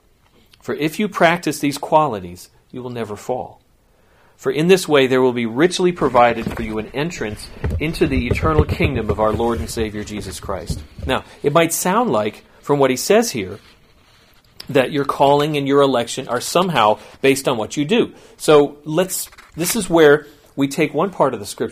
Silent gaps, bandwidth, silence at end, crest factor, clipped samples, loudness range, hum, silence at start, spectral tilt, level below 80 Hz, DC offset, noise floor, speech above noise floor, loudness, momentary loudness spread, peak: none; 15.5 kHz; 0 s; 18 dB; under 0.1%; 4 LU; none; 0.65 s; -5 dB/octave; -36 dBFS; under 0.1%; -55 dBFS; 38 dB; -18 LUFS; 14 LU; 0 dBFS